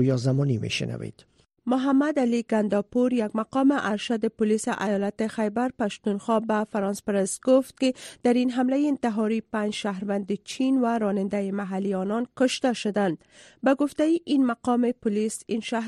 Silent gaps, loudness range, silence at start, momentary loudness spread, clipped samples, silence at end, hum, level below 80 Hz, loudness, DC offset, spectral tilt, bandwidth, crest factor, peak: none; 2 LU; 0 s; 6 LU; under 0.1%; 0 s; none; -64 dBFS; -25 LUFS; under 0.1%; -6 dB/octave; 13 kHz; 16 dB; -8 dBFS